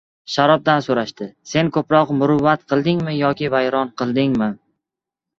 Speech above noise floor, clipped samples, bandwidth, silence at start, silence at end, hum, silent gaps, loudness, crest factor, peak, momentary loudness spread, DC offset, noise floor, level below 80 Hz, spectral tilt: 68 dB; under 0.1%; 7.6 kHz; 0.3 s; 0.85 s; none; none; -18 LUFS; 16 dB; -2 dBFS; 8 LU; under 0.1%; -85 dBFS; -54 dBFS; -6.5 dB/octave